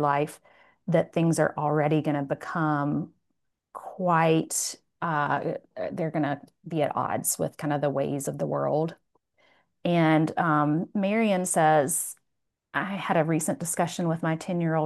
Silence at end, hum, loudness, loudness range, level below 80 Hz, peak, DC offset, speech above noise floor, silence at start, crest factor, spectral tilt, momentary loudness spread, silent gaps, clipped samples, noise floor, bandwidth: 0 s; none; -26 LUFS; 4 LU; -72 dBFS; -8 dBFS; under 0.1%; 54 dB; 0 s; 18 dB; -5.5 dB/octave; 11 LU; none; under 0.1%; -80 dBFS; 12.5 kHz